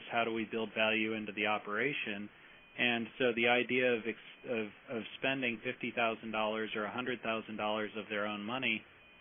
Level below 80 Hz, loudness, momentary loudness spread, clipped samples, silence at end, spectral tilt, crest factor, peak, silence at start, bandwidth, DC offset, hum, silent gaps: -76 dBFS; -35 LUFS; 9 LU; under 0.1%; 0.35 s; 0 dB/octave; 20 dB; -16 dBFS; 0 s; 3.7 kHz; under 0.1%; none; none